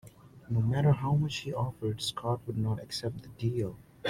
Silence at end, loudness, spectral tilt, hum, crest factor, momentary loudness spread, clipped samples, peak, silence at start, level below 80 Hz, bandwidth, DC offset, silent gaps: 0 s; -32 LUFS; -6.5 dB/octave; none; 16 dB; 9 LU; under 0.1%; -16 dBFS; 0.05 s; -58 dBFS; 14 kHz; under 0.1%; none